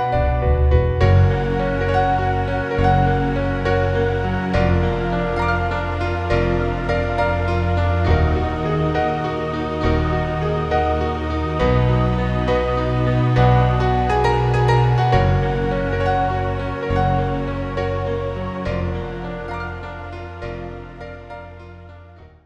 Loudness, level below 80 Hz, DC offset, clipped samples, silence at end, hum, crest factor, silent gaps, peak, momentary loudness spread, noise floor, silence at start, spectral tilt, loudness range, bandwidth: -19 LUFS; -26 dBFS; under 0.1%; under 0.1%; 0.2 s; none; 16 dB; none; -2 dBFS; 12 LU; -43 dBFS; 0 s; -8 dB/octave; 8 LU; 8 kHz